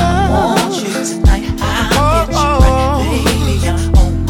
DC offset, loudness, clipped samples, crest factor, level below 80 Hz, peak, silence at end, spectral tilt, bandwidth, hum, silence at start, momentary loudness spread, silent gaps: under 0.1%; -13 LUFS; under 0.1%; 12 dB; -16 dBFS; 0 dBFS; 0 s; -5.5 dB/octave; 17.5 kHz; none; 0 s; 5 LU; none